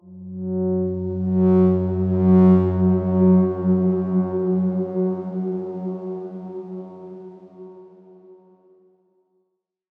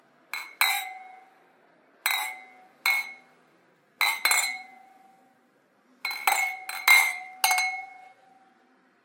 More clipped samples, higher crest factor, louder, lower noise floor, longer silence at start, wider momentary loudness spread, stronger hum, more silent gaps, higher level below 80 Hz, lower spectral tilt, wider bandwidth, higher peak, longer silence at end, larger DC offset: neither; second, 16 dB vs 28 dB; first, -20 LUFS vs -24 LUFS; first, -74 dBFS vs -64 dBFS; second, 0.05 s vs 0.35 s; about the same, 18 LU vs 20 LU; neither; neither; first, -66 dBFS vs under -90 dBFS; first, -13 dB/octave vs 4 dB/octave; second, 2.4 kHz vs 17 kHz; second, -6 dBFS vs 0 dBFS; first, 1.65 s vs 1.1 s; neither